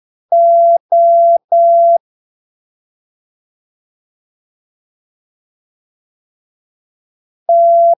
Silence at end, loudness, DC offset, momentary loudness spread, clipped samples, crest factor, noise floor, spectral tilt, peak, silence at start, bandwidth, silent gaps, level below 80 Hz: 0.05 s; -10 LUFS; under 0.1%; 6 LU; under 0.1%; 10 dB; under -90 dBFS; -7.5 dB/octave; -4 dBFS; 0.3 s; 1 kHz; 0.80-0.89 s, 1.44-1.48 s, 2.00-7.46 s; under -90 dBFS